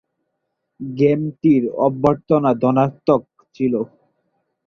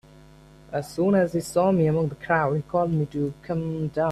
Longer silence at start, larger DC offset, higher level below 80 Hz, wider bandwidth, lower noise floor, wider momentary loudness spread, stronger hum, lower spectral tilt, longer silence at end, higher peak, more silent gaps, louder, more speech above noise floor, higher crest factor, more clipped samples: about the same, 0.8 s vs 0.7 s; neither; about the same, -56 dBFS vs -54 dBFS; second, 6.6 kHz vs 13.5 kHz; first, -75 dBFS vs -50 dBFS; about the same, 8 LU vs 9 LU; neither; first, -10 dB/octave vs -7.5 dB/octave; first, 0.8 s vs 0 s; first, -2 dBFS vs -8 dBFS; neither; first, -18 LUFS vs -24 LUFS; first, 58 dB vs 26 dB; about the same, 18 dB vs 16 dB; neither